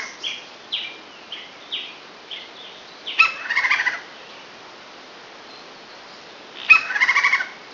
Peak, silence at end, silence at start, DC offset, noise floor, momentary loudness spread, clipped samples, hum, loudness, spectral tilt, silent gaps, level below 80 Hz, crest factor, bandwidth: 0 dBFS; 0 s; 0 s; under 0.1%; -41 dBFS; 25 LU; under 0.1%; none; -18 LUFS; 0.5 dB/octave; none; -70 dBFS; 24 dB; 6 kHz